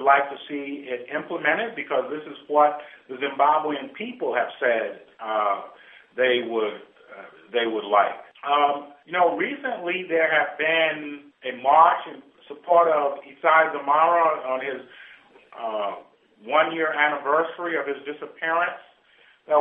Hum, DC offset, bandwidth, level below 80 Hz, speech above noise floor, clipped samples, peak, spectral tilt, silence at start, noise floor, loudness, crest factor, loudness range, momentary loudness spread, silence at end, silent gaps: none; under 0.1%; 3.9 kHz; -82 dBFS; 34 dB; under 0.1%; -4 dBFS; -7 dB/octave; 0 s; -57 dBFS; -23 LUFS; 20 dB; 5 LU; 16 LU; 0 s; none